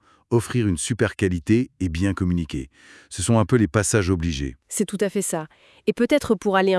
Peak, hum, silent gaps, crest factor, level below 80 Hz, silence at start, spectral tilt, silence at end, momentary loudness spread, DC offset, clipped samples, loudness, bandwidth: -4 dBFS; none; none; 18 dB; -44 dBFS; 0.3 s; -5.5 dB/octave; 0 s; 10 LU; under 0.1%; under 0.1%; -22 LUFS; 12 kHz